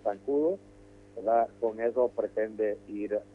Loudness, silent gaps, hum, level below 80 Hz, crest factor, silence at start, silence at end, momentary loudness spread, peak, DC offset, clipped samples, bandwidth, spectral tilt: -30 LUFS; none; 50 Hz at -60 dBFS; -66 dBFS; 16 dB; 0.05 s; 0.1 s; 9 LU; -14 dBFS; under 0.1%; under 0.1%; 8 kHz; -8 dB/octave